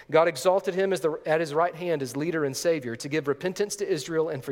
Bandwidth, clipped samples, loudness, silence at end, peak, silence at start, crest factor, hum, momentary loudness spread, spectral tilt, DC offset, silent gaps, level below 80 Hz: 17 kHz; under 0.1%; -27 LUFS; 0 s; -6 dBFS; 0 s; 20 dB; none; 6 LU; -4.5 dB/octave; under 0.1%; none; -68 dBFS